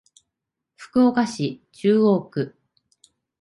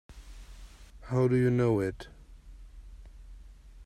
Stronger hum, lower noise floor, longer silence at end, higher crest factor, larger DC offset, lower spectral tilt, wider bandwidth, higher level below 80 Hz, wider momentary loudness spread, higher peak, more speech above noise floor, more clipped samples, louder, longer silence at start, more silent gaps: neither; first, -83 dBFS vs -50 dBFS; first, 0.95 s vs 0 s; about the same, 16 dB vs 18 dB; neither; second, -7 dB/octave vs -8.5 dB/octave; about the same, 11.5 kHz vs 10.5 kHz; second, -64 dBFS vs -50 dBFS; second, 11 LU vs 26 LU; first, -6 dBFS vs -14 dBFS; first, 63 dB vs 23 dB; neither; first, -21 LUFS vs -28 LUFS; first, 0.8 s vs 0.1 s; neither